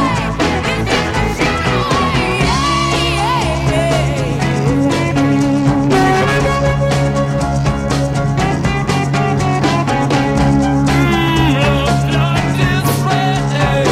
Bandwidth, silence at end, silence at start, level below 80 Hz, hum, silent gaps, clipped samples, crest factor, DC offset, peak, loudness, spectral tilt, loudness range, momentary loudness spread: 15 kHz; 0 s; 0 s; -26 dBFS; none; none; under 0.1%; 12 dB; under 0.1%; -2 dBFS; -14 LUFS; -5.5 dB/octave; 2 LU; 3 LU